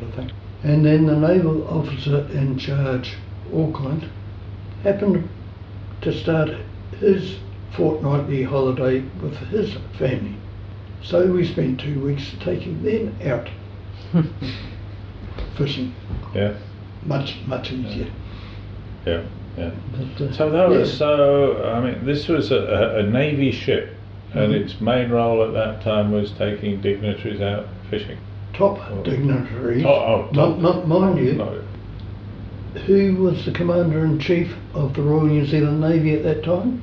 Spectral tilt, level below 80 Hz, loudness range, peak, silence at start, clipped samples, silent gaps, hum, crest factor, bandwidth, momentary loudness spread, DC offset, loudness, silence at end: -9 dB/octave; -42 dBFS; 8 LU; -4 dBFS; 0 s; under 0.1%; none; none; 16 dB; 6.6 kHz; 18 LU; under 0.1%; -21 LUFS; 0 s